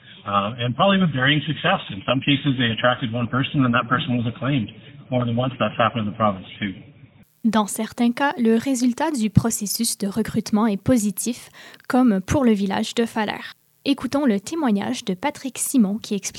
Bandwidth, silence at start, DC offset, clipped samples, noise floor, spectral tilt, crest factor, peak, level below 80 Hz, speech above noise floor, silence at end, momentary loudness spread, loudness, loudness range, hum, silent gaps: 16 kHz; 0.05 s; under 0.1%; under 0.1%; -50 dBFS; -5 dB/octave; 22 dB; 0 dBFS; -52 dBFS; 29 dB; 0 s; 8 LU; -21 LUFS; 3 LU; none; none